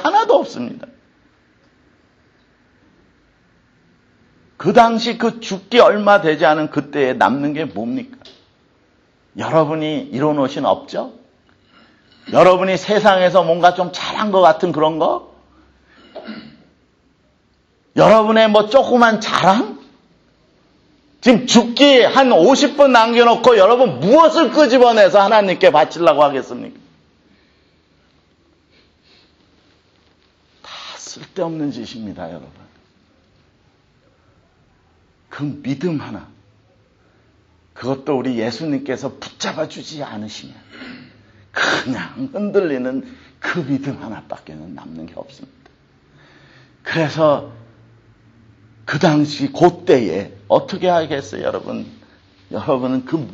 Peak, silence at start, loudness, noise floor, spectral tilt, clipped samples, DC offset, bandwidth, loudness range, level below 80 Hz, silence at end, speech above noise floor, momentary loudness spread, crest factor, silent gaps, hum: 0 dBFS; 0 s; -15 LUFS; -58 dBFS; -5 dB/octave; under 0.1%; under 0.1%; 8.4 kHz; 18 LU; -58 dBFS; 0 s; 43 dB; 22 LU; 18 dB; none; none